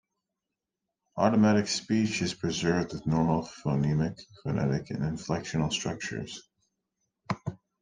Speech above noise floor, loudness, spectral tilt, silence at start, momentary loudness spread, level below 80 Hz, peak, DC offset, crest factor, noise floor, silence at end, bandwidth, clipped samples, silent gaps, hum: 59 dB; -29 LUFS; -5.5 dB/octave; 1.15 s; 13 LU; -56 dBFS; -8 dBFS; under 0.1%; 20 dB; -87 dBFS; 0.25 s; 9.8 kHz; under 0.1%; none; none